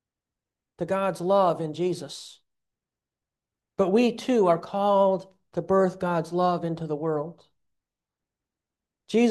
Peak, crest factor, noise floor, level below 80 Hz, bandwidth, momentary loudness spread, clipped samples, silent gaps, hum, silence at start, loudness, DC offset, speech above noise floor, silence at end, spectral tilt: -10 dBFS; 18 dB; -89 dBFS; -66 dBFS; 12.5 kHz; 13 LU; under 0.1%; none; none; 0.8 s; -25 LUFS; under 0.1%; 65 dB; 0 s; -6.5 dB/octave